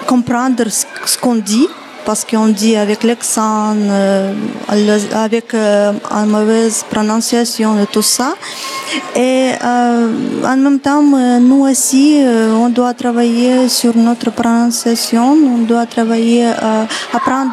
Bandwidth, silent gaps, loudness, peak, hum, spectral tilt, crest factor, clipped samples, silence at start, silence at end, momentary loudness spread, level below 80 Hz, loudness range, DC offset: 14 kHz; none; -12 LUFS; -2 dBFS; none; -4 dB/octave; 10 dB; under 0.1%; 0 s; 0 s; 6 LU; -58 dBFS; 3 LU; under 0.1%